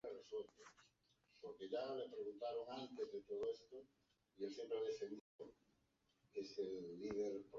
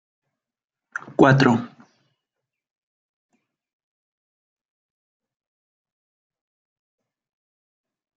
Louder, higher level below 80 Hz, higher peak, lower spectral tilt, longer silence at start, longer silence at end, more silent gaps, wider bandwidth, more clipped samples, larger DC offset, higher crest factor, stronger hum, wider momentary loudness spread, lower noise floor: second, -49 LUFS vs -18 LUFS; second, -84 dBFS vs -66 dBFS; second, -34 dBFS vs -2 dBFS; second, -4 dB/octave vs -7 dB/octave; second, 0.05 s vs 1.2 s; second, 0 s vs 6.5 s; first, 5.21-5.39 s vs none; about the same, 7.4 kHz vs 7.8 kHz; neither; neither; second, 16 dB vs 26 dB; neither; second, 15 LU vs 21 LU; second, -83 dBFS vs -89 dBFS